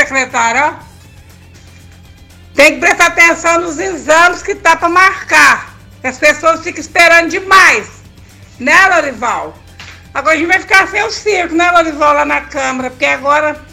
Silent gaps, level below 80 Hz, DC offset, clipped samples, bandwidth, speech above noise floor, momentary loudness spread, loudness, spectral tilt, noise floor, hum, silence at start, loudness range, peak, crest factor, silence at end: none; -42 dBFS; under 0.1%; 0.7%; 19 kHz; 27 dB; 11 LU; -9 LUFS; -2 dB/octave; -37 dBFS; none; 0 s; 3 LU; 0 dBFS; 12 dB; 0.1 s